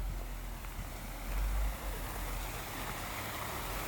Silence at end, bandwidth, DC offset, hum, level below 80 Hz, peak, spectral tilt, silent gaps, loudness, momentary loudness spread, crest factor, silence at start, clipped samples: 0 s; over 20 kHz; under 0.1%; none; -40 dBFS; -26 dBFS; -4 dB/octave; none; -40 LUFS; 6 LU; 12 dB; 0 s; under 0.1%